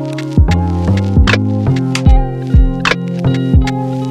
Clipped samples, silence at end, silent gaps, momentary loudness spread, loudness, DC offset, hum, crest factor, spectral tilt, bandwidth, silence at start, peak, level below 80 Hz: under 0.1%; 0 s; none; 4 LU; -13 LUFS; under 0.1%; none; 12 dB; -6.5 dB/octave; 10.5 kHz; 0 s; 0 dBFS; -16 dBFS